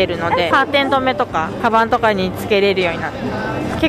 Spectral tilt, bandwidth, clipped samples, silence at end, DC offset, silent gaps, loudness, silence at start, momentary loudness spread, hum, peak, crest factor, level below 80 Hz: -5.5 dB/octave; 15.5 kHz; under 0.1%; 0 s; under 0.1%; none; -16 LUFS; 0 s; 8 LU; none; -2 dBFS; 14 dB; -42 dBFS